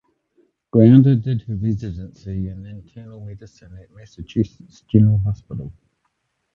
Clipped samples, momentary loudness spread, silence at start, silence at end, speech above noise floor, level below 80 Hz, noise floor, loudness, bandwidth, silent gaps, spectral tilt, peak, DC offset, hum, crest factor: under 0.1%; 26 LU; 0.75 s; 0.85 s; 53 dB; -42 dBFS; -71 dBFS; -18 LUFS; 6.6 kHz; none; -10.5 dB/octave; 0 dBFS; under 0.1%; none; 20 dB